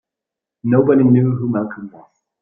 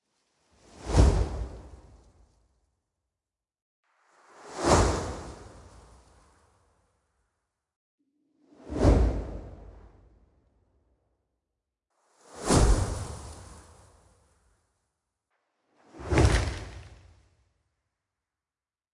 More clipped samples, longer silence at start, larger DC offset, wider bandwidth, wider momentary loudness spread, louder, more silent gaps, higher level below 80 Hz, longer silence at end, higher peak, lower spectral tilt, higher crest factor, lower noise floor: neither; second, 0.65 s vs 0.8 s; neither; second, 3.5 kHz vs 11.5 kHz; second, 18 LU vs 25 LU; first, -15 LUFS vs -26 LUFS; second, none vs 3.62-3.83 s, 7.76-7.98 s; second, -56 dBFS vs -34 dBFS; second, 0.5 s vs 2.15 s; first, -2 dBFS vs -6 dBFS; first, -13.5 dB/octave vs -5.5 dB/octave; second, 16 dB vs 26 dB; second, -85 dBFS vs under -90 dBFS